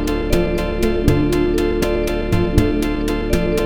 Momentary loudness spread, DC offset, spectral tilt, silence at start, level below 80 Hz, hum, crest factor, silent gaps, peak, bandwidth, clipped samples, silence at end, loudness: 3 LU; under 0.1%; -6.5 dB/octave; 0 s; -24 dBFS; none; 16 dB; none; 0 dBFS; 17.5 kHz; under 0.1%; 0 s; -18 LUFS